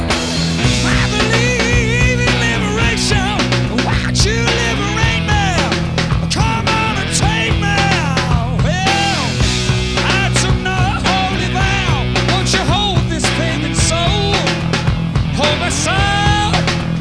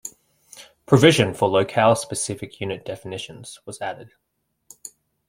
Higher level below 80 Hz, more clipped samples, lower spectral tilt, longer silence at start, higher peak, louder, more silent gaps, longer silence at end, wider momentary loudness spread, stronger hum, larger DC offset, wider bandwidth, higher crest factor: first, -24 dBFS vs -58 dBFS; neither; about the same, -4.5 dB/octave vs -5 dB/octave; about the same, 0 s vs 0.05 s; about the same, -2 dBFS vs -2 dBFS; first, -14 LUFS vs -20 LUFS; neither; second, 0 s vs 0.4 s; second, 3 LU vs 25 LU; neither; first, 0.4% vs under 0.1%; second, 11 kHz vs 16.5 kHz; second, 12 dB vs 22 dB